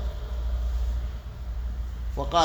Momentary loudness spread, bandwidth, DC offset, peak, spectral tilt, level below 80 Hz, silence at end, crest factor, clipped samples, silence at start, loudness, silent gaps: 7 LU; 20 kHz; under 0.1%; -8 dBFS; -5.5 dB/octave; -30 dBFS; 0 s; 20 dB; under 0.1%; 0 s; -32 LUFS; none